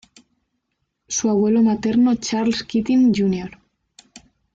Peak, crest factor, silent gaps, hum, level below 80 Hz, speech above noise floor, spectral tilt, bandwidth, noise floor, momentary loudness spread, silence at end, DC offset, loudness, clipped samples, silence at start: -8 dBFS; 12 dB; none; none; -54 dBFS; 57 dB; -5 dB/octave; 7.8 kHz; -74 dBFS; 7 LU; 0.35 s; under 0.1%; -19 LUFS; under 0.1%; 1.1 s